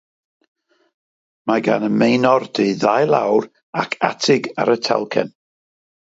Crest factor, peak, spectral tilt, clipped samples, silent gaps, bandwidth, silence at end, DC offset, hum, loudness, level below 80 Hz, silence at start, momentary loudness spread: 18 dB; 0 dBFS; -5 dB/octave; under 0.1%; 3.63-3.73 s; 7.8 kHz; 0.85 s; under 0.1%; none; -18 LUFS; -66 dBFS; 1.45 s; 8 LU